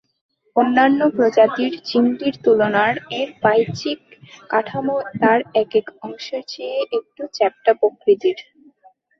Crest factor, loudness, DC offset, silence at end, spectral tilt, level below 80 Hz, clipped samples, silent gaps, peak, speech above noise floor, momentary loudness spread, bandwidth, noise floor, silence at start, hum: 18 dB; -19 LUFS; under 0.1%; 0.75 s; -6 dB/octave; -64 dBFS; under 0.1%; none; -2 dBFS; 36 dB; 13 LU; 6.8 kHz; -54 dBFS; 0.55 s; none